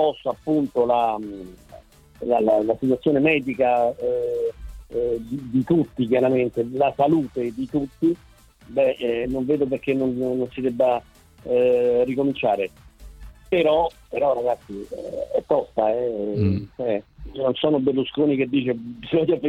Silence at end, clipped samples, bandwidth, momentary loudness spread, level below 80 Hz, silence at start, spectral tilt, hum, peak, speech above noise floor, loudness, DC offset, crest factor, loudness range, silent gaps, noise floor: 0 s; under 0.1%; 12.5 kHz; 10 LU; -50 dBFS; 0 s; -8 dB/octave; none; -6 dBFS; 25 dB; -22 LUFS; under 0.1%; 16 dB; 2 LU; none; -47 dBFS